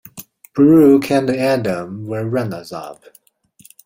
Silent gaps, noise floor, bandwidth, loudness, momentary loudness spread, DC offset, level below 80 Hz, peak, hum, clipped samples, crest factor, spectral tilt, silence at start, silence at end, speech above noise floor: none; -50 dBFS; 16.5 kHz; -15 LUFS; 22 LU; under 0.1%; -56 dBFS; -2 dBFS; none; under 0.1%; 16 dB; -7 dB/octave; 0.15 s; 0.95 s; 35 dB